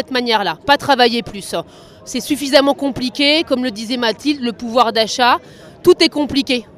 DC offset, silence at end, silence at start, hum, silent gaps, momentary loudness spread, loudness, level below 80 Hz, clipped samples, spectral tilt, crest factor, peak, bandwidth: under 0.1%; 0.15 s; 0 s; none; none; 9 LU; -15 LUFS; -50 dBFS; under 0.1%; -3 dB/octave; 16 dB; 0 dBFS; 15.5 kHz